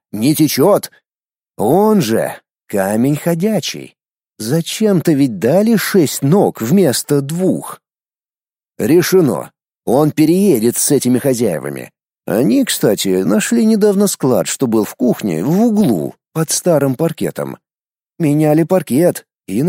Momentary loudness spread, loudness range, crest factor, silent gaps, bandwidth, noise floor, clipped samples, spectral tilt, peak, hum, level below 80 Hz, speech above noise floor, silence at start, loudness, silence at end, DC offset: 11 LU; 3 LU; 14 dB; none; 16.5 kHz; under -90 dBFS; under 0.1%; -5.5 dB/octave; 0 dBFS; none; -58 dBFS; over 77 dB; 0.15 s; -14 LUFS; 0 s; under 0.1%